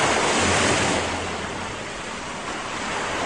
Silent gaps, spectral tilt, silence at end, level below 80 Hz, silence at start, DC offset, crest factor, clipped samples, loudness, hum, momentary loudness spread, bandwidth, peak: none; -2.5 dB/octave; 0 s; -46 dBFS; 0 s; 0.3%; 16 dB; under 0.1%; -23 LUFS; none; 12 LU; 11 kHz; -8 dBFS